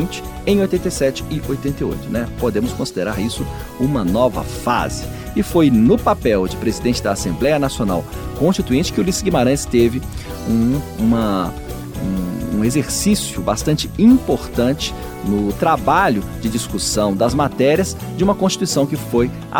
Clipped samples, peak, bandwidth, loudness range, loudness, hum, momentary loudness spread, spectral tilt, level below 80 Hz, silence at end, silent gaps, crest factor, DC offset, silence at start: under 0.1%; -2 dBFS; 19 kHz; 3 LU; -18 LUFS; none; 9 LU; -5.5 dB/octave; -32 dBFS; 0 s; none; 16 dB; under 0.1%; 0 s